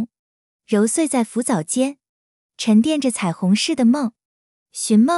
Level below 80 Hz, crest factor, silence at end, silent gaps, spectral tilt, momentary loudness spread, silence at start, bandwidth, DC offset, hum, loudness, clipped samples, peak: -68 dBFS; 14 dB; 0 s; 0.19-0.59 s, 2.09-2.49 s, 4.25-4.66 s; -4.5 dB/octave; 10 LU; 0 s; 11.5 kHz; under 0.1%; none; -19 LUFS; under 0.1%; -6 dBFS